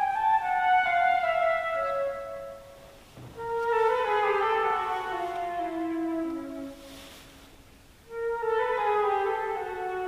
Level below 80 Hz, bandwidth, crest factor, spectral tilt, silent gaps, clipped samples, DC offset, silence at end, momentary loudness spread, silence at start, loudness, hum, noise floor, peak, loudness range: -58 dBFS; 15.5 kHz; 14 dB; -4.5 dB/octave; none; under 0.1%; under 0.1%; 0 s; 18 LU; 0 s; -27 LUFS; none; -53 dBFS; -14 dBFS; 6 LU